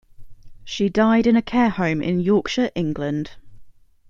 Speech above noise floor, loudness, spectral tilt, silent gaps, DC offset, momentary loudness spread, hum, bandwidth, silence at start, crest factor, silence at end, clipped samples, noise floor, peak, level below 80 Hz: 25 dB; -20 LUFS; -6.5 dB/octave; none; under 0.1%; 10 LU; none; 7.4 kHz; 0.2 s; 18 dB; 0.4 s; under 0.1%; -44 dBFS; -4 dBFS; -48 dBFS